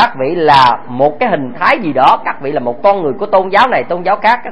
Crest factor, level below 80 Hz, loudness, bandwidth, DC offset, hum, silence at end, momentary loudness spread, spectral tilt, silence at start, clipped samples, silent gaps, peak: 12 dB; -48 dBFS; -12 LUFS; 11 kHz; 4%; none; 0 s; 7 LU; -6 dB/octave; 0 s; 0.4%; none; 0 dBFS